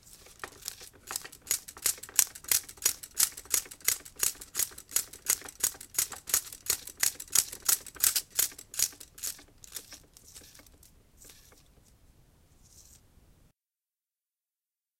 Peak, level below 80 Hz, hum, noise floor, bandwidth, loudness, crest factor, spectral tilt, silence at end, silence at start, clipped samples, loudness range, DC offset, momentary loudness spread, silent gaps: 0 dBFS; -62 dBFS; none; under -90 dBFS; 17 kHz; -29 LUFS; 34 dB; 1.5 dB/octave; 2.2 s; 0.25 s; under 0.1%; 10 LU; under 0.1%; 18 LU; none